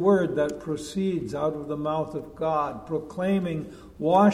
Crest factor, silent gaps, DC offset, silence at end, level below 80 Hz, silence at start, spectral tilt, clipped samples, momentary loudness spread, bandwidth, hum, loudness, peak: 18 dB; none; under 0.1%; 0 s; -54 dBFS; 0 s; -7 dB/octave; under 0.1%; 10 LU; 12.5 kHz; none; -27 LUFS; -8 dBFS